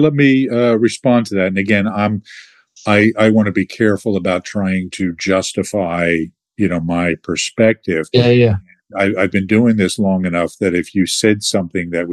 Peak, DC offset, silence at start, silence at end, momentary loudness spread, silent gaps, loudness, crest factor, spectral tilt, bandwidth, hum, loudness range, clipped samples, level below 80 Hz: -2 dBFS; under 0.1%; 0 s; 0 s; 7 LU; none; -15 LUFS; 14 dB; -5.5 dB/octave; 12.5 kHz; none; 3 LU; under 0.1%; -54 dBFS